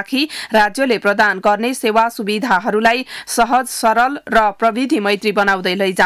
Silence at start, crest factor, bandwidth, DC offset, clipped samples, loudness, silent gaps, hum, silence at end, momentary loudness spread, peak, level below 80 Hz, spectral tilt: 0 s; 10 dB; 16 kHz; under 0.1%; under 0.1%; -15 LUFS; none; none; 0 s; 4 LU; -4 dBFS; -50 dBFS; -3.5 dB/octave